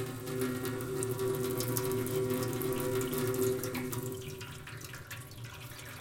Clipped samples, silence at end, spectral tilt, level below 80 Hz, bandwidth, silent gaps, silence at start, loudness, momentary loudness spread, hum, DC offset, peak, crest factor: under 0.1%; 0 s; -5 dB/octave; -58 dBFS; 17 kHz; none; 0 s; -35 LUFS; 12 LU; none; under 0.1%; -12 dBFS; 22 dB